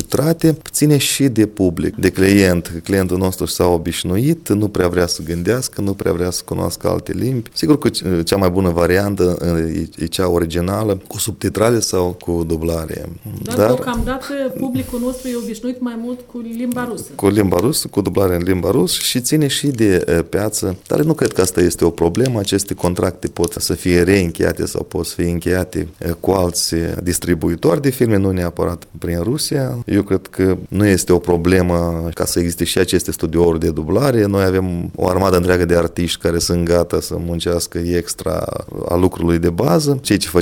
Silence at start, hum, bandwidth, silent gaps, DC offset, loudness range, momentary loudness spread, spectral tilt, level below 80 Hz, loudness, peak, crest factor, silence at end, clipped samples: 0 s; none; 18 kHz; none; under 0.1%; 3 LU; 8 LU; -5 dB/octave; -36 dBFS; -17 LUFS; 0 dBFS; 16 dB; 0 s; under 0.1%